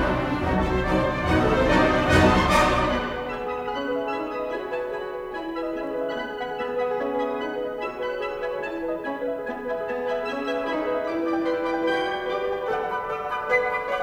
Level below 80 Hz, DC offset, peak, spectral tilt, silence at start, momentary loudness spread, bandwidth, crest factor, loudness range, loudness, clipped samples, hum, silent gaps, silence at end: -40 dBFS; under 0.1%; -4 dBFS; -6 dB/octave; 0 s; 10 LU; 16.5 kHz; 20 dB; 8 LU; -25 LUFS; under 0.1%; none; none; 0 s